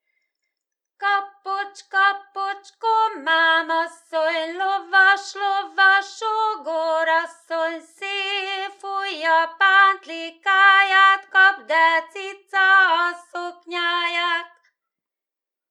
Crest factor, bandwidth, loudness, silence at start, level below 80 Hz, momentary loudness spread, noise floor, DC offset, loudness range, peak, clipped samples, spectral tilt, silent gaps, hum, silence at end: 18 dB; 11 kHz; -19 LUFS; 1 s; under -90 dBFS; 14 LU; -89 dBFS; under 0.1%; 6 LU; -2 dBFS; under 0.1%; 1.5 dB/octave; none; none; 1.25 s